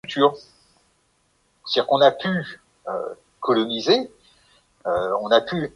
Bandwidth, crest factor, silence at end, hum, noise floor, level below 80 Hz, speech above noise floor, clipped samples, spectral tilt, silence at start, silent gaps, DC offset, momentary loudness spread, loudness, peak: 11 kHz; 20 dB; 0.05 s; none; -65 dBFS; -62 dBFS; 45 dB; under 0.1%; -5.5 dB/octave; 0.05 s; none; under 0.1%; 20 LU; -21 LUFS; -4 dBFS